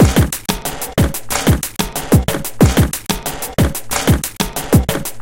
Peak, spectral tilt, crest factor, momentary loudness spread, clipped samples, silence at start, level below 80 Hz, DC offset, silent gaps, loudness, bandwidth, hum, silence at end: 0 dBFS; -5 dB/octave; 16 dB; 8 LU; under 0.1%; 0 s; -24 dBFS; under 0.1%; none; -16 LUFS; 17.5 kHz; none; 0 s